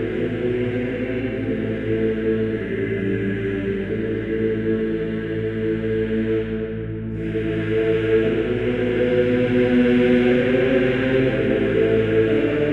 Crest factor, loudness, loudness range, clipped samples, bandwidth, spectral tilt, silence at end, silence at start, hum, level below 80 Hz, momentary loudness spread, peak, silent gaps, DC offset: 14 dB; -21 LUFS; 5 LU; under 0.1%; 7.4 kHz; -8.5 dB/octave; 0 s; 0 s; none; -40 dBFS; 7 LU; -6 dBFS; none; under 0.1%